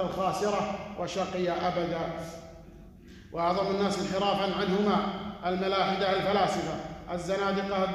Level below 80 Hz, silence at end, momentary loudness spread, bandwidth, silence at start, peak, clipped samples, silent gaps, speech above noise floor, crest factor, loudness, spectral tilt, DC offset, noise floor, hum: -54 dBFS; 0 s; 10 LU; 13 kHz; 0 s; -14 dBFS; under 0.1%; none; 21 dB; 16 dB; -29 LUFS; -5.5 dB/octave; under 0.1%; -49 dBFS; none